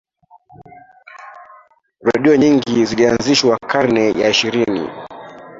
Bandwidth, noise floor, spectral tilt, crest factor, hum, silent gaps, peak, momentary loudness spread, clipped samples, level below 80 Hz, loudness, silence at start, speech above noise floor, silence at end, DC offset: 7.8 kHz; -49 dBFS; -4.5 dB/octave; 16 dB; none; none; 0 dBFS; 21 LU; under 0.1%; -52 dBFS; -15 LUFS; 1.15 s; 35 dB; 0 s; under 0.1%